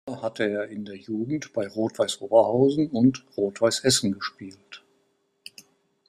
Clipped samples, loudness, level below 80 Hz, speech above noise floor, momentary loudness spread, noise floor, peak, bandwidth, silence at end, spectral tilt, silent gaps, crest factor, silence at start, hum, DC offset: under 0.1%; -24 LUFS; -62 dBFS; 45 dB; 22 LU; -70 dBFS; -4 dBFS; 15 kHz; 1.3 s; -4.5 dB/octave; none; 22 dB; 0.05 s; none; under 0.1%